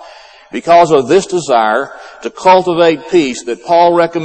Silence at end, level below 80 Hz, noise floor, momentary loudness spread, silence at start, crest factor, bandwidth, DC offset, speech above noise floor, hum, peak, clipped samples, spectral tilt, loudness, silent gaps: 0 s; -52 dBFS; -37 dBFS; 15 LU; 0 s; 12 dB; 8.8 kHz; under 0.1%; 26 dB; none; 0 dBFS; under 0.1%; -5 dB/octave; -11 LUFS; none